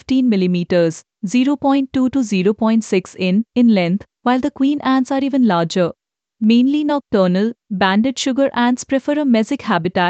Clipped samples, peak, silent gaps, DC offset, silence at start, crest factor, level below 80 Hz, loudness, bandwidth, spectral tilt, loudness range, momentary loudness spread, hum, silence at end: under 0.1%; -2 dBFS; none; under 0.1%; 0.1 s; 14 dB; -56 dBFS; -17 LUFS; 8.8 kHz; -6 dB/octave; 1 LU; 5 LU; none; 0 s